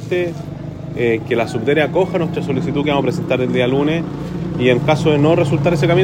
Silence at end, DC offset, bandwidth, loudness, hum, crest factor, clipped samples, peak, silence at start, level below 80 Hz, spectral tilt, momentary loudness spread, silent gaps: 0 s; under 0.1%; 14.5 kHz; -17 LUFS; none; 16 dB; under 0.1%; -2 dBFS; 0 s; -42 dBFS; -7 dB/octave; 10 LU; none